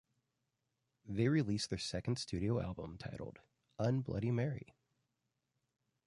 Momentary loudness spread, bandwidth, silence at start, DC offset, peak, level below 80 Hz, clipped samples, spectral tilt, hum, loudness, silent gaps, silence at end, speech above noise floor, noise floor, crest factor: 14 LU; 11.5 kHz; 1.05 s; under 0.1%; -20 dBFS; -60 dBFS; under 0.1%; -6 dB/octave; none; -38 LUFS; none; 1.45 s; 49 dB; -86 dBFS; 20 dB